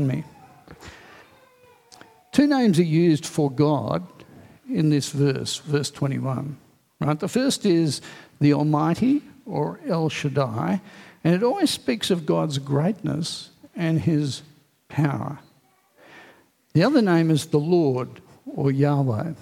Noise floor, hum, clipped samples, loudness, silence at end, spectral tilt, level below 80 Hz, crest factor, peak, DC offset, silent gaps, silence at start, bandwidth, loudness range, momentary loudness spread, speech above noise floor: -61 dBFS; none; under 0.1%; -23 LUFS; 0.05 s; -6.5 dB/octave; -62 dBFS; 18 dB; -4 dBFS; under 0.1%; none; 0 s; 15.5 kHz; 4 LU; 13 LU; 39 dB